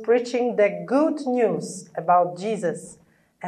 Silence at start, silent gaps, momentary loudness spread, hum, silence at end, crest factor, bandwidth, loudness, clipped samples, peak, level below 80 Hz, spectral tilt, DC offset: 0 s; none; 9 LU; none; 0 s; 16 dB; 11 kHz; -23 LUFS; under 0.1%; -6 dBFS; -74 dBFS; -5.5 dB/octave; under 0.1%